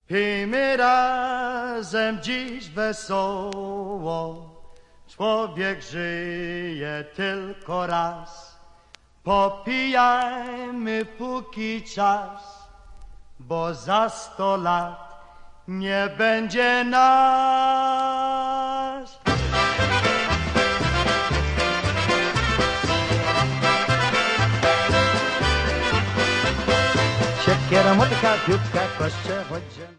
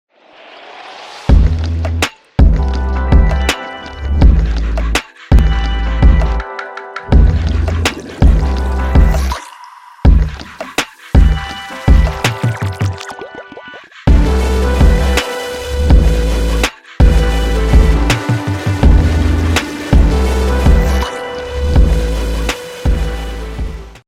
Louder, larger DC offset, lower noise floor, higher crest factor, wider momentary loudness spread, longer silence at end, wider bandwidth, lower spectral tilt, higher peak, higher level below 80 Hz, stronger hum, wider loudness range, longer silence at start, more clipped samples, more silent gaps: second, -22 LUFS vs -14 LUFS; neither; first, -52 dBFS vs -40 dBFS; first, 18 dB vs 12 dB; about the same, 11 LU vs 13 LU; about the same, 0.05 s vs 0.15 s; second, 11 kHz vs 14.5 kHz; about the same, -5 dB/octave vs -6 dB/octave; second, -4 dBFS vs 0 dBFS; second, -40 dBFS vs -14 dBFS; neither; first, 8 LU vs 3 LU; second, 0.1 s vs 0.5 s; neither; neither